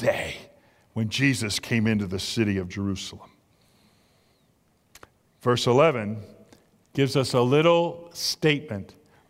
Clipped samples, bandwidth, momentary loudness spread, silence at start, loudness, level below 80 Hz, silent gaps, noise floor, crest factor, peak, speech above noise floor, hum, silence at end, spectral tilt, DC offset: under 0.1%; 16 kHz; 16 LU; 0 s; -24 LUFS; -58 dBFS; none; -65 dBFS; 20 dB; -6 dBFS; 41 dB; none; 0.45 s; -5 dB/octave; under 0.1%